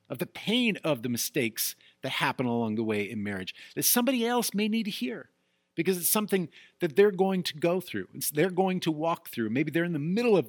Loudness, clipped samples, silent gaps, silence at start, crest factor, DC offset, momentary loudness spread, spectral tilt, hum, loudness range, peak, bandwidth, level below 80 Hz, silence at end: -28 LUFS; under 0.1%; none; 0.1 s; 18 dB; under 0.1%; 10 LU; -4 dB/octave; none; 2 LU; -10 dBFS; 19 kHz; -78 dBFS; 0 s